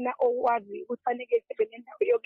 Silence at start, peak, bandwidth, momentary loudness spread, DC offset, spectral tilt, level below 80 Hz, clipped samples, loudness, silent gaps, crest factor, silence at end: 0 s; -14 dBFS; 4.3 kHz; 6 LU; under 0.1%; -7 dB/octave; -78 dBFS; under 0.1%; -29 LUFS; none; 14 dB; 0.1 s